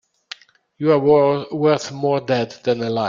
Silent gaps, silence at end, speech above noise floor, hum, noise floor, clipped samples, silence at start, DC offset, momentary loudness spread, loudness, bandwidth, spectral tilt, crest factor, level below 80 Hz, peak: none; 0 s; 23 dB; none; -41 dBFS; under 0.1%; 0.8 s; under 0.1%; 23 LU; -18 LUFS; 7.6 kHz; -6.5 dB/octave; 18 dB; -60 dBFS; -2 dBFS